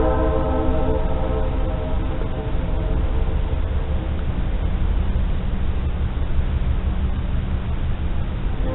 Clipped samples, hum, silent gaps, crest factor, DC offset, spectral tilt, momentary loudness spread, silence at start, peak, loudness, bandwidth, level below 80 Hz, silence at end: under 0.1%; none; none; 14 dB; 0.8%; -7.5 dB/octave; 4 LU; 0 s; -6 dBFS; -24 LUFS; 4.1 kHz; -22 dBFS; 0 s